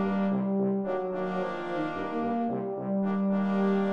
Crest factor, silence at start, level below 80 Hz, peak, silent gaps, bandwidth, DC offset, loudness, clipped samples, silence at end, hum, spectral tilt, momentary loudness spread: 12 dB; 0 s; -68 dBFS; -16 dBFS; none; 5.8 kHz; 0.3%; -29 LUFS; under 0.1%; 0 s; none; -9.5 dB/octave; 5 LU